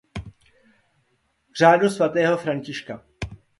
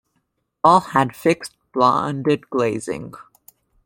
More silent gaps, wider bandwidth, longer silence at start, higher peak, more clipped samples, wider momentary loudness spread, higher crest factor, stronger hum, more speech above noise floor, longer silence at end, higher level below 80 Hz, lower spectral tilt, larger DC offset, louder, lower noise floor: neither; second, 11.5 kHz vs 16.5 kHz; second, 0.15 s vs 0.65 s; about the same, -2 dBFS vs -2 dBFS; neither; first, 22 LU vs 14 LU; about the same, 22 dB vs 20 dB; neither; second, 49 dB vs 53 dB; second, 0.25 s vs 0.65 s; first, -50 dBFS vs -60 dBFS; about the same, -5.5 dB/octave vs -6 dB/octave; neither; about the same, -20 LUFS vs -19 LUFS; about the same, -68 dBFS vs -71 dBFS